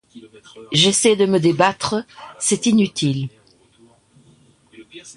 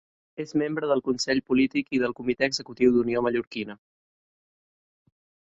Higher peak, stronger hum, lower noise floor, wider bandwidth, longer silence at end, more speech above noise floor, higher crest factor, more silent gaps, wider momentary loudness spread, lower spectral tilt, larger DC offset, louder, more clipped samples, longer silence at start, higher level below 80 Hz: first, -2 dBFS vs -8 dBFS; neither; second, -53 dBFS vs under -90 dBFS; first, 11.5 kHz vs 8 kHz; second, 0.05 s vs 1.75 s; second, 35 dB vs over 65 dB; about the same, 18 dB vs 20 dB; second, none vs 3.47-3.51 s; about the same, 13 LU vs 12 LU; about the same, -4 dB/octave vs -4.5 dB/octave; neither; first, -17 LUFS vs -25 LUFS; neither; second, 0.15 s vs 0.4 s; about the same, -58 dBFS vs -60 dBFS